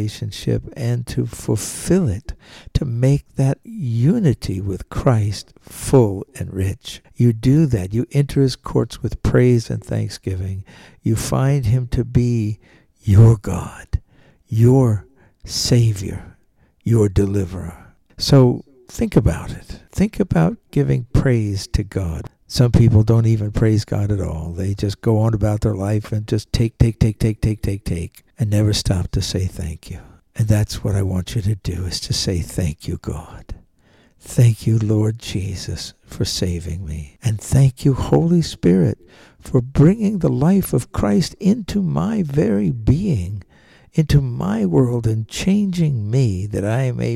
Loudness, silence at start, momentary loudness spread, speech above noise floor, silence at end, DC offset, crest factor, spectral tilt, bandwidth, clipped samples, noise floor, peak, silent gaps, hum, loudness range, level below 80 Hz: -19 LUFS; 0 s; 13 LU; 39 dB; 0 s; under 0.1%; 16 dB; -7 dB/octave; 14 kHz; under 0.1%; -57 dBFS; -4 dBFS; none; none; 4 LU; -34 dBFS